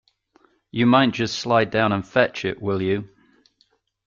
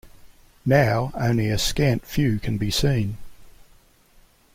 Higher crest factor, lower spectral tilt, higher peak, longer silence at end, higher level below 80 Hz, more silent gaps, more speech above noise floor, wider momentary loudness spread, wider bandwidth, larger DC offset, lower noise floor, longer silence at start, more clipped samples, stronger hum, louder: about the same, 20 dB vs 20 dB; about the same, -5.5 dB/octave vs -5.5 dB/octave; about the same, -4 dBFS vs -4 dBFS; about the same, 1 s vs 1.05 s; second, -58 dBFS vs -38 dBFS; neither; first, 45 dB vs 34 dB; about the same, 9 LU vs 8 LU; second, 7.4 kHz vs 16.5 kHz; neither; first, -65 dBFS vs -55 dBFS; first, 0.75 s vs 0.05 s; neither; neither; about the same, -21 LUFS vs -22 LUFS